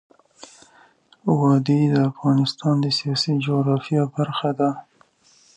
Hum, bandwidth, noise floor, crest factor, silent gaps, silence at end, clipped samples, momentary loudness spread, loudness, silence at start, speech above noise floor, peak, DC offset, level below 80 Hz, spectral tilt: none; 9.8 kHz; -57 dBFS; 16 dB; none; 0.75 s; under 0.1%; 6 LU; -21 LUFS; 0.4 s; 37 dB; -6 dBFS; under 0.1%; -66 dBFS; -7 dB/octave